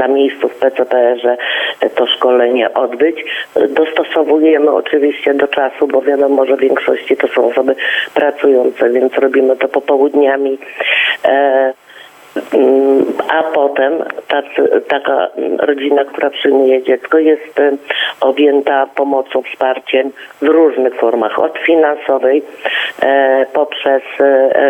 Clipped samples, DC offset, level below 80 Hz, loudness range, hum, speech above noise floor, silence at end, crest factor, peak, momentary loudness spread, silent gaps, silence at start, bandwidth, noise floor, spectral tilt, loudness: under 0.1%; under 0.1%; -66 dBFS; 1 LU; none; 26 dB; 0 s; 12 dB; 0 dBFS; 6 LU; none; 0 s; 8.2 kHz; -38 dBFS; -4.5 dB/octave; -12 LUFS